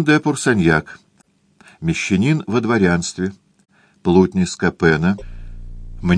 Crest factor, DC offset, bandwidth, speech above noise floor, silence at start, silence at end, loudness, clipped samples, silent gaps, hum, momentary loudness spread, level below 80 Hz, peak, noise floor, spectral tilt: 18 dB; under 0.1%; 10.5 kHz; 41 dB; 0 s; 0 s; -18 LUFS; under 0.1%; none; none; 17 LU; -38 dBFS; 0 dBFS; -58 dBFS; -6 dB/octave